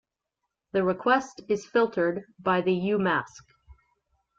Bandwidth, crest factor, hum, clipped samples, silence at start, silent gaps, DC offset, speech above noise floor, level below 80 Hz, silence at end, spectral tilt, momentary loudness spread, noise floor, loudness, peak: 7.6 kHz; 18 dB; none; under 0.1%; 0.75 s; none; under 0.1%; 58 dB; -64 dBFS; 0.65 s; -6 dB/octave; 7 LU; -84 dBFS; -26 LUFS; -10 dBFS